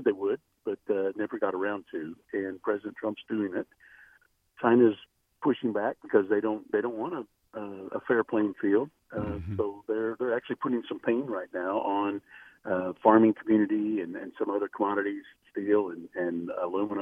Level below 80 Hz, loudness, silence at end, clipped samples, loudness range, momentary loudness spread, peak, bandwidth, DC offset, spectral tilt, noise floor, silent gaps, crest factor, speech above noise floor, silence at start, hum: -66 dBFS; -29 LUFS; 0 s; under 0.1%; 5 LU; 12 LU; -6 dBFS; 3.7 kHz; under 0.1%; -9 dB/octave; -64 dBFS; none; 24 dB; 36 dB; 0 s; none